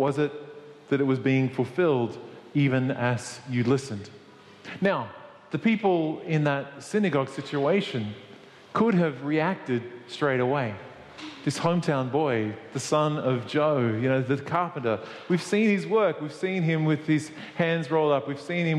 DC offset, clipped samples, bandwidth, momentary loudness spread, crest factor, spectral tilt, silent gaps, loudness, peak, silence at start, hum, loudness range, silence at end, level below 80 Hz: under 0.1%; under 0.1%; 12 kHz; 13 LU; 16 dB; -6.5 dB/octave; none; -26 LUFS; -10 dBFS; 0 s; none; 2 LU; 0 s; -70 dBFS